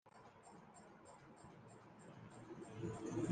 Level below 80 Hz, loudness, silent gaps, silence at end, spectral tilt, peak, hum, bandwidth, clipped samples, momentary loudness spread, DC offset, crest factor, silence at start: -78 dBFS; -54 LUFS; none; 0 s; -6.5 dB/octave; -26 dBFS; none; 9.6 kHz; under 0.1%; 15 LU; under 0.1%; 24 dB; 0.05 s